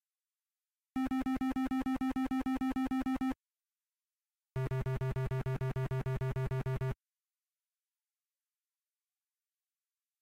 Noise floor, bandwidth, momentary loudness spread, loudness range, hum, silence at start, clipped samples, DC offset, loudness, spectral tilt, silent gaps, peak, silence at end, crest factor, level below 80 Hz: under -90 dBFS; 16 kHz; 5 LU; 7 LU; none; 0.95 s; under 0.1%; under 0.1%; -36 LUFS; -8 dB/octave; none; -28 dBFS; 3.25 s; 10 dB; -52 dBFS